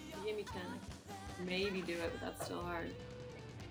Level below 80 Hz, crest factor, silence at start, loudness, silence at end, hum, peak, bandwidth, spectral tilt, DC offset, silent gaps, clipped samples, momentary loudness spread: -60 dBFS; 18 dB; 0 s; -43 LUFS; 0 s; none; -26 dBFS; over 20 kHz; -5 dB/octave; under 0.1%; none; under 0.1%; 12 LU